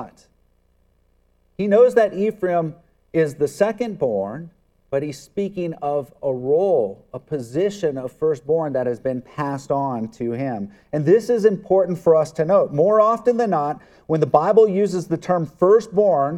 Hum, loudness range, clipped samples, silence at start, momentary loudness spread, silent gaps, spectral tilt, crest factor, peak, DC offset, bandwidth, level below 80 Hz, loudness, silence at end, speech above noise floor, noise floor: none; 6 LU; under 0.1%; 0 s; 12 LU; none; -7.5 dB/octave; 20 dB; 0 dBFS; under 0.1%; 12 kHz; -60 dBFS; -20 LUFS; 0 s; 42 dB; -61 dBFS